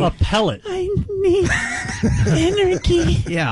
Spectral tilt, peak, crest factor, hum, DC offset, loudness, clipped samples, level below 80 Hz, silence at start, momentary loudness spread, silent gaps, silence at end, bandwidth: -5.5 dB/octave; -8 dBFS; 10 dB; none; under 0.1%; -18 LUFS; under 0.1%; -28 dBFS; 0 s; 6 LU; none; 0 s; 11.5 kHz